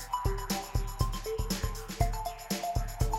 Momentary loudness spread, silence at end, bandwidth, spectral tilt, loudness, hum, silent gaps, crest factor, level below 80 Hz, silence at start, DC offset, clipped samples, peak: 3 LU; 0 s; 16.5 kHz; -4.5 dB/octave; -34 LUFS; none; none; 18 dB; -36 dBFS; 0 s; under 0.1%; under 0.1%; -14 dBFS